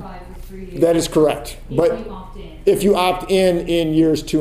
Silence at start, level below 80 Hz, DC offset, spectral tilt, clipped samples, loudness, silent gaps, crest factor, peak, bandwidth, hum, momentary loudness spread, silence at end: 0 s; -36 dBFS; under 0.1%; -5.5 dB/octave; under 0.1%; -17 LUFS; none; 14 dB; -2 dBFS; 16 kHz; none; 20 LU; 0 s